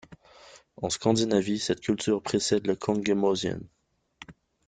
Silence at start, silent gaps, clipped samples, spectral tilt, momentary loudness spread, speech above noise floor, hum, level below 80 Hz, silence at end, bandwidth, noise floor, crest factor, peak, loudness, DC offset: 0.1 s; none; under 0.1%; -4.5 dB/octave; 7 LU; 27 dB; none; -60 dBFS; 0.35 s; 9.6 kHz; -53 dBFS; 20 dB; -8 dBFS; -27 LUFS; under 0.1%